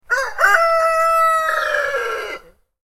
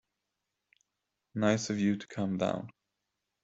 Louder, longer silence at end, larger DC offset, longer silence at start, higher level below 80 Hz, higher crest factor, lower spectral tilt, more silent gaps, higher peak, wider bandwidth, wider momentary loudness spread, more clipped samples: first, -16 LUFS vs -32 LUFS; second, 0.5 s vs 0.75 s; neither; second, 0.1 s vs 1.35 s; first, -50 dBFS vs -72 dBFS; second, 16 dB vs 22 dB; second, 0 dB/octave vs -5.5 dB/octave; neither; first, -2 dBFS vs -12 dBFS; first, 16.5 kHz vs 8 kHz; about the same, 12 LU vs 12 LU; neither